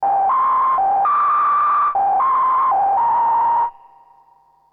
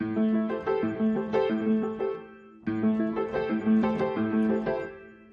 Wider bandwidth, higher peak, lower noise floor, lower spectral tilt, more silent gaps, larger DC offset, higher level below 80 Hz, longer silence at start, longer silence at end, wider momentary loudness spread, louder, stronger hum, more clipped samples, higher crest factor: second, 4.1 kHz vs 5.2 kHz; about the same, -12 dBFS vs -14 dBFS; first, -54 dBFS vs -47 dBFS; second, -6 dB/octave vs -9 dB/octave; neither; neither; about the same, -60 dBFS vs -60 dBFS; about the same, 0 s vs 0 s; first, 1 s vs 0.2 s; second, 2 LU vs 9 LU; first, -16 LUFS vs -27 LUFS; neither; neither; second, 6 dB vs 14 dB